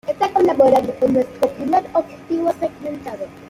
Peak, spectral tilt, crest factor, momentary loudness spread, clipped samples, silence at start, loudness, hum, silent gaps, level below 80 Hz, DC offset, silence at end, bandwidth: -2 dBFS; -6.5 dB/octave; 16 dB; 15 LU; under 0.1%; 0.05 s; -18 LUFS; none; none; -54 dBFS; under 0.1%; 0.05 s; 15.5 kHz